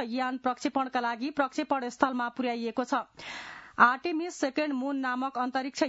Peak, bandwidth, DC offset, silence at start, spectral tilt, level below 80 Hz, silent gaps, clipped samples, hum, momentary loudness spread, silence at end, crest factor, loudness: -6 dBFS; 7.6 kHz; under 0.1%; 0 s; -1.5 dB/octave; -74 dBFS; none; under 0.1%; none; 9 LU; 0 s; 24 dB; -29 LUFS